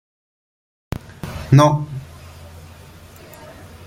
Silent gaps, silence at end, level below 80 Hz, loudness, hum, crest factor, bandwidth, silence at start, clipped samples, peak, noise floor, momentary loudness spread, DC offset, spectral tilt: none; 0 s; -44 dBFS; -16 LUFS; none; 20 dB; 15.5 kHz; 0.9 s; under 0.1%; -2 dBFS; -42 dBFS; 27 LU; under 0.1%; -7 dB/octave